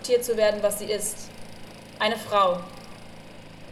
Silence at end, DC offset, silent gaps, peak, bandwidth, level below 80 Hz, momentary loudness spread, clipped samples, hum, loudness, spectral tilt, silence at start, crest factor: 0 s; under 0.1%; none; -10 dBFS; 15.5 kHz; -54 dBFS; 23 LU; under 0.1%; none; -25 LUFS; -2.5 dB/octave; 0 s; 18 dB